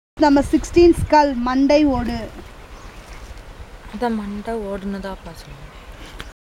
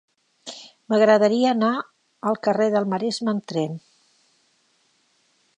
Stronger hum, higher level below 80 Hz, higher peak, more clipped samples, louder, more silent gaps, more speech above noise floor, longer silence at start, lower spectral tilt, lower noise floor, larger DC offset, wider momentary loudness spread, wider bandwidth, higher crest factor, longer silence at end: neither; first, -36 dBFS vs -78 dBFS; about the same, -2 dBFS vs -4 dBFS; neither; first, -18 LUFS vs -21 LUFS; neither; second, 20 dB vs 45 dB; second, 0.15 s vs 0.45 s; about the same, -6 dB/octave vs -5.5 dB/octave; second, -38 dBFS vs -65 dBFS; neither; first, 26 LU vs 22 LU; first, 13.5 kHz vs 10.5 kHz; about the same, 18 dB vs 20 dB; second, 0.15 s vs 1.8 s